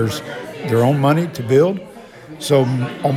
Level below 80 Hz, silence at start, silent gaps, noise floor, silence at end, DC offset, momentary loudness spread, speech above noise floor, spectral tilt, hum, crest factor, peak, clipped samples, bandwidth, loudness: -58 dBFS; 0 s; none; -37 dBFS; 0 s; under 0.1%; 15 LU; 21 dB; -6.5 dB/octave; none; 16 dB; -2 dBFS; under 0.1%; 15.5 kHz; -17 LUFS